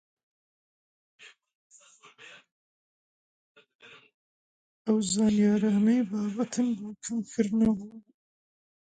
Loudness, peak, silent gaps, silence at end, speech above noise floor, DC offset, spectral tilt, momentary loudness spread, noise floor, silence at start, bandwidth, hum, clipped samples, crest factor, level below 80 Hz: -27 LUFS; -14 dBFS; 1.55-1.70 s, 2.52-3.55 s, 3.75-3.79 s, 4.14-4.85 s; 1 s; 30 dB; under 0.1%; -5.5 dB/octave; 11 LU; -57 dBFS; 1.2 s; 9.4 kHz; none; under 0.1%; 18 dB; -64 dBFS